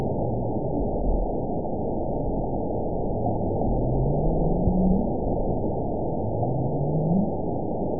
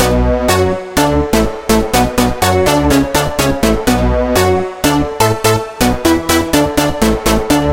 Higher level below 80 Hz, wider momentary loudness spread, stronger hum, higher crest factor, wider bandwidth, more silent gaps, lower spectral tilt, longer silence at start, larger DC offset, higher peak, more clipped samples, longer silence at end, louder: second, -32 dBFS vs -22 dBFS; about the same, 5 LU vs 3 LU; neither; about the same, 14 dB vs 12 dB; second, 1 kHz vs 17.5 kHz; neither; first, -19 dB/octave vs -4.5 dB/octave; about the same, 0 s vs 0 s; about the same, 2% vs 1%; second, -10 dBFS vs 0 dBFS; neither; about the same, 0 s vs 0 s; second, -26 LUFS vs -13 LUFS